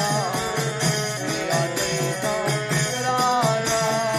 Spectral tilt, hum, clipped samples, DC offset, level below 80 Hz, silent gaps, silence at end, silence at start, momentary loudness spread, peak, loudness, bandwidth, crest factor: -3.5 dB/octave; none; under 0.1%; under 0.1%; -54 dBFS; none; 0 s; 0 s; 4 LU; -8 dBFS; -22 LUFS; 15.5 kHz; 16 dB